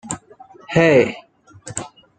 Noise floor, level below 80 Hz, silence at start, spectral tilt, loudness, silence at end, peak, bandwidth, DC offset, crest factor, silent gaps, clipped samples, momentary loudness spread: -45 dBFS; -52 dBFS; 0.05 s; -5 dB/octave; -16 LUFS; 0.3 s; -2 dBFS; 9.4 kHz; under 0.1%; 20 dB; none; under 0.1%; 17 LU